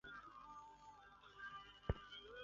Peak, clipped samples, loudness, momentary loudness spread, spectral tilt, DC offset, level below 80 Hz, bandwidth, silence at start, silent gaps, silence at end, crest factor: -24 dBFS; under 0.1%; -54 LUFS; 14 LU; -4 dB/octave; under 0.1%; -60 dBFS; 7.4 kHz; 0.05 s; none; 0 s; 30 dB